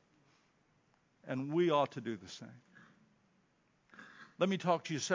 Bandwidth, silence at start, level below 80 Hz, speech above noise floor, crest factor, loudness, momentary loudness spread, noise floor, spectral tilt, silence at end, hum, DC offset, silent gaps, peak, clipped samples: 7.6 kHz; 1.25 s; -82 dBFS; 39 dB; 22 dB; -35 LUFS; 24 LU; -74 dBFS; -5 dB/octave; 0 s; none; under 0.1%; none; -16 dBFS; under 0.1%